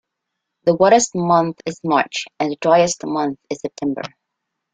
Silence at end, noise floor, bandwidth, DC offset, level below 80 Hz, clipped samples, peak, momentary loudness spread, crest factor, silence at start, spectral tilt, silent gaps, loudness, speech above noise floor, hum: 0.65 s; -79 dBFS; 9.6 kHz; under 0.1%; -60 dBFS; under 0.1%; -2 dBFS; 13 LU; 18 dB; 0.65 s; -4.5 dB/octave; none; -18 LUFS; 61 dB; none